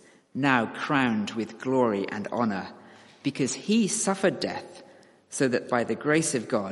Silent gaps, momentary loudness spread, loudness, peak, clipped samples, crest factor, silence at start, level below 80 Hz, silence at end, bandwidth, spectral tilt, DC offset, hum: none; 10 LU; -26 LUFS; -6 dBFS; under 0.1%; 22 dB; 0.35 s; -70 dBFS; 0 s; 11.5 kHz; -4.5 dB/octave; under 0.1%; none